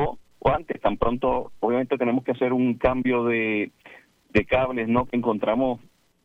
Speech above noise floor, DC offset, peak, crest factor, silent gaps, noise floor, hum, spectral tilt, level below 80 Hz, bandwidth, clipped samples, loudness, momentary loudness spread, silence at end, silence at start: 28 dB; under 0.1%; -6 dBFS; 18 dB; none; -51 dBFS; none; -8.5 dB/octave; -44 dBFS; 5.6 kHz; under 0.1%; -24 LUFS; 4 LU; 0.45 s; 0 s